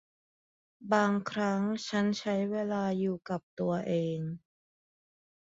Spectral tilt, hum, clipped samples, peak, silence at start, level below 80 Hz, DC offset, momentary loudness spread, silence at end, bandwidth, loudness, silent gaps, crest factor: -6.5 dB/octave; none; under 0.1%; -14 dBFS; 0.8 s; -72 dBFS; under 0.1%; 10 LU; 1.2 s; 7.8 kHz; -32 LUFS; 3.43-3.57 s; 20 dB